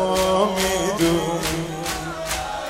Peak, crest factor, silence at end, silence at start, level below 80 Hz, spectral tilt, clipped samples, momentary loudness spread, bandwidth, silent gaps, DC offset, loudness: -6 dBFS; 16 dB; 0 s; 0 s; -40 dBFS; -4 dB/octave; under 0.1%; 7 LU; 16 kHz; none; under 0.1%; -22 LUFS